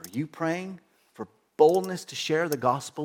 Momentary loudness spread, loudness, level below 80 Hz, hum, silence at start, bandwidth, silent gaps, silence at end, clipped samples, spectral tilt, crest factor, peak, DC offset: 21 LU; -26 LUFS; -76 dBFS; none; 0.05 s; 17.5 kHz; none; 0 s; under 0.1%; -5 dB/octave; 20 dB; -6 dBFS; under 0.1%